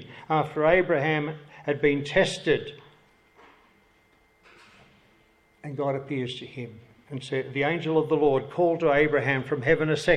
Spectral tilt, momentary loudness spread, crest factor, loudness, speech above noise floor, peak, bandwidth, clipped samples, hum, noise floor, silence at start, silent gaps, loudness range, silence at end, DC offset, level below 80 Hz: -6 dB/octave; 17 LU; 20 dB; -25 LUFS; 38 dB; -8 dBFS; 10.5 kHz; under 0.1%; none; -62 dBFS; 0 s; none; 11 LU; 0 s; under 0.1%; -54 dBFS